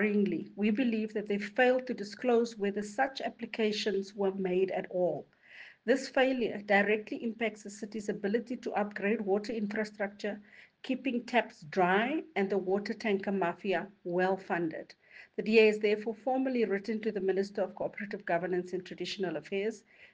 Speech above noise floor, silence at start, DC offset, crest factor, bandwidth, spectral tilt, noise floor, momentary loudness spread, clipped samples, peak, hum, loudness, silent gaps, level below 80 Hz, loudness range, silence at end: 22 dB; 0 s; under 0.1%; 20 dB; 9.4 kHz; -6 dB/octave; -54 dBFS; 11 LU; under 0.1%; -12 dBFS; none; -32 LUFS; none; -76 dBFS; 4 LU; 0.05 s